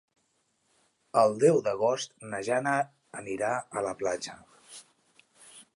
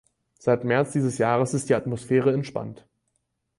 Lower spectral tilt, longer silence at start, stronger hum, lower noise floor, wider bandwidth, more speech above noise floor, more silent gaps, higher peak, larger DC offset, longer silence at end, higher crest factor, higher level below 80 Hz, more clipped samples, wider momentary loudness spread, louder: second, -4.5 dB/octave vs -6.5 dB/octave; first, 1.15 s vs 0.45 s; neither; about the same, -74 dBFS vs -76 dBFS; about the same, 11.5 kHz vs 11.5 kHz; second, 46 dB vs 52 dB; neither; about the same, -10 dBFS vs -8 dBFS; neither; second, 0.15 s vs 0.85 s; about the same, 20 dB vs 16 dB; second, -72 dBFS vs -62 dBFS; neither; first, 20 LU vs 9 LU; second, -28 LUFS vs -24 LUFS